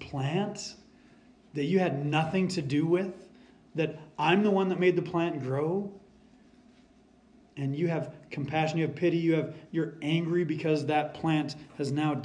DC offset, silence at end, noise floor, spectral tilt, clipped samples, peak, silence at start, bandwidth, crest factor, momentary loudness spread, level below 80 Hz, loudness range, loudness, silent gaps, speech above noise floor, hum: under 0.1%; 0 s; -60 dBFS; -6.5 dB/octave; under 0.1%; -10 dBFS; 0 s; 10 kHz; 20 dB; 12 LU; -68 dBFS; 6 LU; -29 LUFS; none; 31 dB; none